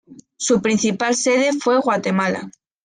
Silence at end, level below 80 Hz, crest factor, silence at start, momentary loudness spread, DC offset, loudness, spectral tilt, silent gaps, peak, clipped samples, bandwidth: 0.35 s; -62 dBFS; 14 dB; 0.1 s; 8 LU; under 0.1%; -18 LUFS; -4 dB/octave; none; -6 dBFS; under 0.1%; 10 kHz